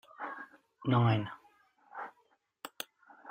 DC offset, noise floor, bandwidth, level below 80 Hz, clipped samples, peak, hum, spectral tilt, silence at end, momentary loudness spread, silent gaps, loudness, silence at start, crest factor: under 0.1%; -73 dBFS; 15.5 kHz; -70 dBFS; under 0.1%; -14 dBFS; none; -7 dB/octave; 0 s; 23 LU; none; -34 LUFS; 0.2 s; 22 dB